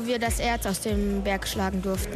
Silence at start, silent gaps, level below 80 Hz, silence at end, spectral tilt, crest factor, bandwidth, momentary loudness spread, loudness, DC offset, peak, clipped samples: 0 s; none; -34 dBFS; 0 s; -4.5 dB/octave; 14 dB; 15 kHz; 2 LU; -27 LUFS; under 0.1%; -12 dBFS; under 0.1%